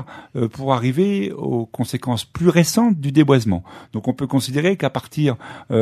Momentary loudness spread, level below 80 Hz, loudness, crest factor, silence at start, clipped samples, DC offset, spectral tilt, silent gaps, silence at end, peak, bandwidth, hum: 10 LU; -52 dBFS; -19 LUFS; 18 dB; 0 s; under 0.1%; under 0.1%; -6 dB/octave; none; 0 s; 0 dBFS; 13.5 kHz; none